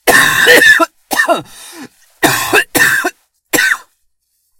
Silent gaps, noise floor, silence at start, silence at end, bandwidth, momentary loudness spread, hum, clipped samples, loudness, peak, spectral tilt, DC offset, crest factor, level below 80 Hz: none; -62 dBFS; 0.05 s; 0.8 s; over 20 kHz; 12 LU; none; 0.6%; -10 LUFS; 0 dBFS; -1.5 dB/octave; under 0.1%; 12 dB; -46 dBFS